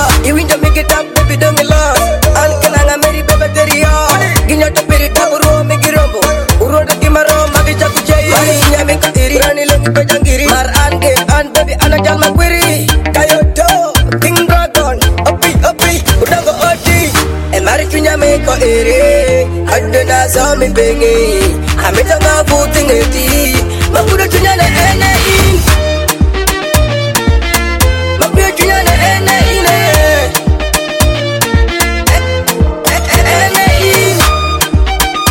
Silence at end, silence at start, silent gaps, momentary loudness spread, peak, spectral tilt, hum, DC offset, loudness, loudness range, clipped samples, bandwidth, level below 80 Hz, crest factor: 0 s; 0 s; none; 3 LU; 0 dBFS; -4 dB/octave; none; under 0.1%; -9 LUFS; 1 LU; 0.3%; 17.5 kHz; -16 dBFS; 8 dB